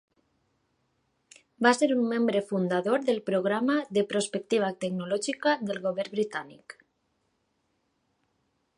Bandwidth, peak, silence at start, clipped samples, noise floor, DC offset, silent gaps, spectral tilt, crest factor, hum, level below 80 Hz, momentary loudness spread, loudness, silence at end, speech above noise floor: 11.5 kHz; -6 dBFS; 1.6 s; under 0.1%; -75 dBFS; under 0.1%; none; -5 dB/octave; 22 dB; none; -78 dBFS; 6 LU; -27 LUFS; 2.05 s; 48 dB